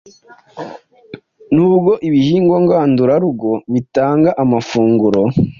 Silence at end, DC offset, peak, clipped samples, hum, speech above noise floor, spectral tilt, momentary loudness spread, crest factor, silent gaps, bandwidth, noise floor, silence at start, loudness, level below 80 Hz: 0.05 s; under 0.1%; -2 dBFS; under 0.1%; none; 24 dB; -8.5 dB/octave; 7 LU; 12 dB; none; 7.2 kHz; -37 dBFS; 0.55 s; -13 LUFS; -46 dBFS